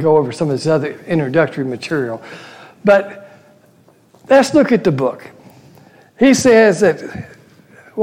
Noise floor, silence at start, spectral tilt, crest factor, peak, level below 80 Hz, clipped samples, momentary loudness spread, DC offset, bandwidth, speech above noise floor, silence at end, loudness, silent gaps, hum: -50 dBFS; 0 s; -5.5 dB/octave; 14 dB; -2 dBFS; -54 dBFS; under 0.1%; 21 LU; under 0.1%; 15.5 kHz; 36 dB; 0 s; -14 LUFS; none; none